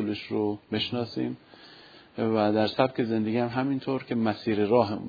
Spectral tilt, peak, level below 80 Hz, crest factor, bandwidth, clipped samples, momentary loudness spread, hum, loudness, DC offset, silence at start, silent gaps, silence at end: -8 dB/octave; -6 dBFS; -66 dBFS; 20 dB; 5 kHz; under 0.1%; 8 LU; none; -27 LUFS; under 0.1%; 0 s; none; 0 s